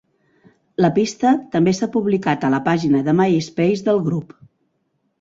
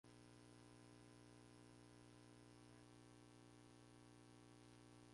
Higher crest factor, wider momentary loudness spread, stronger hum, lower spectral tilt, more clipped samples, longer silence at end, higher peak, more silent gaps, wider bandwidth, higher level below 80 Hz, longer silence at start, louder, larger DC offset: about the same, 16 dB vs 12 dB; about the same, 3 LU vs 1 LU; second, none vs 60 Hz at -70 dBFS; first, -6.5 dB/octave vs -5 dB/octave; neither; first, 0.95 s vs 0 s; first, -2 dBFS vs -54 dBFS; neither; second, 7.8 kHz vs 11.5 kHz; first, -58 dBFS vs -82 dBFS; first, 0.8 s vs 0.05 s; first, -18 LUFS vs -66 LUFS; neither